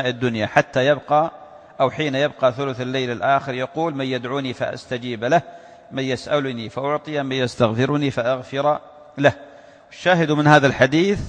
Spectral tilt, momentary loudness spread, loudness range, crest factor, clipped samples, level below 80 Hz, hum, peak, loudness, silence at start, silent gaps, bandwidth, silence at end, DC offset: -6 dB/octave; 10 LU; 5 LU; 20 dB; under 0.1%; -54 dBFS; none; 0 dBFS; -20 LUFS; 0 s; none; 9.8 kHz; 0 s; under 0.1%